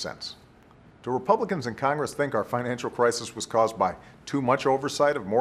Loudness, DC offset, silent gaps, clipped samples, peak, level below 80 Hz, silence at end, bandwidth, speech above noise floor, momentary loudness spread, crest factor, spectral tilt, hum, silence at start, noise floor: -26 LUFS; under 0.1%; none; under 0.1%; -6 dBFS; -62 dBFS; 0 s; 14.5 kHz; 28 dB; 9 LU; 20 dB; -4.5 dB/octave; none; 0 s; -54 dBFS